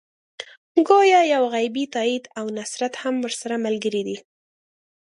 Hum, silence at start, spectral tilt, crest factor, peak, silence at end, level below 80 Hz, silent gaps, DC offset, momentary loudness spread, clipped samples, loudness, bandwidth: none; 0.4 s; -3.5 dB/octave; 20 dB; -4 dBFS; 0.85 s; -76 dBFS; 0.57-0.75 s; under 0.1%; 16 LU; under 0.1%; -21 LUFS; 11.5 kHz